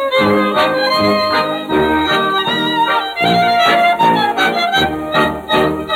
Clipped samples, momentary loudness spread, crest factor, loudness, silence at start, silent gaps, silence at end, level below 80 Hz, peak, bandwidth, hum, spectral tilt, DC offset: under 0.1%; 4 LU; 12 dB; -13 LUFS; 0 s; none; 0 s; -44 dBFS; -2 dBFS; 18.5 kHz; none; -4.5 dB/octave; under 0.1%